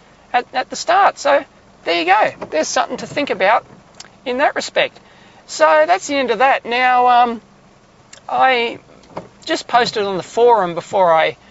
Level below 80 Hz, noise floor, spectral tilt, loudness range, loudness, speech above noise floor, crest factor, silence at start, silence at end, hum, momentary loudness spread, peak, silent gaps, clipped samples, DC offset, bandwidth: -58 dBFS; -48 dBFS; -3 dB/octave; 3 LU; -16 LUFS; 33 dB; 16 dB; 0.35 s; 0.15 s; none; 11 LU; 0 dBFS; none; under 0.1%; under 0.1%; 8 kHz